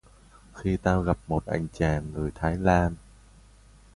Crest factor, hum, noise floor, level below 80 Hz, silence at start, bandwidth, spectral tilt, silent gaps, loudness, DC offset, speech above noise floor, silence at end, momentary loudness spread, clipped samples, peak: 20 dB; none; -54 dBFS; -40 dBFS; 0.55 s; 11.5 kHz; -7.5 dB/octave; none; -27 LUFS; under 0.1%; 28 dB; 0.95 s; 9 LU; under 0.1%; -6 dBFS